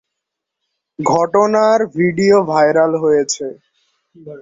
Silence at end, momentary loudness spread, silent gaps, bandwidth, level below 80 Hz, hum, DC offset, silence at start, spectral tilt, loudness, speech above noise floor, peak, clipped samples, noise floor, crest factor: 0 s; 9 LU; none; 7.8 kHz; -58 dBFS; none; under 0.1%; 1 s; -5 dB/octave; -14 LUFS; 65 dB; -2 dBFS; under 0.1%; -79 dBFS; 14 dB